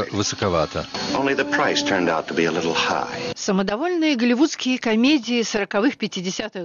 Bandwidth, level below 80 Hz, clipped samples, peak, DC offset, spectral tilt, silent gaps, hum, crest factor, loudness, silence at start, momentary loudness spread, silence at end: 7.4 kHz; -52 dBFS; under 0.1%; -8 dBFS; under 0.1%; -4 dB/octave; none; none; 14 dB; -21 LUFS; 0 s; 7 LU; 0 s